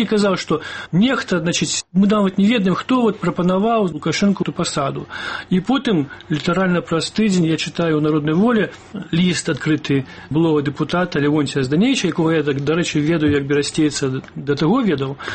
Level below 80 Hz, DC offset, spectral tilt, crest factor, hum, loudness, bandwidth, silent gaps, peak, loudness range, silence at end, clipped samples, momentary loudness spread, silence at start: -50 dBFS; under 0.1%; -5.5 dB/octave; 12 dB; none; -18 LUFS; 8.8 kHz; none; -6 dBFS; 2 LU; 0 s; under 0.1%; 6 LU; 0 s